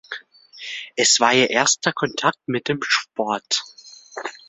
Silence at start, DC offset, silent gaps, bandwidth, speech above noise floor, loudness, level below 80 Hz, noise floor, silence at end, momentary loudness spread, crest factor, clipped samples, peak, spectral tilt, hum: 0.1 s; under 0.1%; none; 8.4 kHz; 22 dB; -19 LUFS; -68 dBFS; -42 dBFS; 0.15 s; 20 LU; 22 dB; under 0.1%; 0 dBFS; -1.5 dB/octave; none